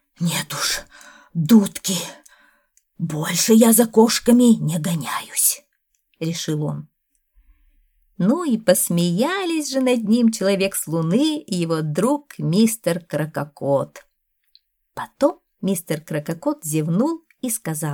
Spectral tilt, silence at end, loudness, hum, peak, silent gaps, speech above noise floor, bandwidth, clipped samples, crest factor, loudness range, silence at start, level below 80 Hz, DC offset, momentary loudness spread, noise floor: -4.5 dB/octave; 0 s; -20 LUFS; none; -2 dBFS; none; 49 dB; 20 kHz; under 0.1%; 18 dB; 8 LU; 0.2 s; -60 dBFS; under 0.1%; 13 LU; -69 dBFS